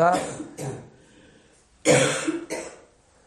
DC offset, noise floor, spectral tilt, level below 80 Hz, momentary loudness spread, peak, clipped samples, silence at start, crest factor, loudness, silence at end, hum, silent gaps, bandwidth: under 0.1%; -57 dBFS; -4 dB/octave; -60 dBFS; 17 LU; -4 dBFS; under 0.1%; 0 s; 22 dB; -25 LUFS; 0.5 s; none; none; 13 kHz